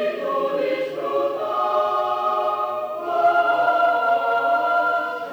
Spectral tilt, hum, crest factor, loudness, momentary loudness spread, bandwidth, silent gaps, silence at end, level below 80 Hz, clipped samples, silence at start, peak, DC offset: -4.5 dB/octave; none; 12 dB; -21 LUFS; 6 LU; 20 kHz; none; 0 s; -72 dBFS; under 0.1%; 0 s; -8 dBFS; under 0.1%